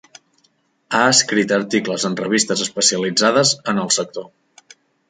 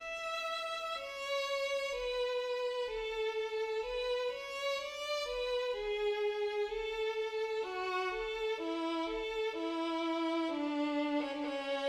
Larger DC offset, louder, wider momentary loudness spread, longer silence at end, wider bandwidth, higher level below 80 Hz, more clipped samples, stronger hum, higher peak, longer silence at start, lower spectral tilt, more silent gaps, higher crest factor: neither; first, -17 LUFS vs -36 LUFS; first, 8 LU vs 3 LU; first, 0.85 s vs 0 s; second, 9.6 kHz vs 15 kHz; about the same, -66 dBFS vs -62 dBFS; neither; neither; first, 0 dBFS vs -24 dBFS; first, 0.9 s vs 0 s; about the same, -2.5 dB/octave vs -2.5 dB/octave; neither; first, 20 dB vs 12 dB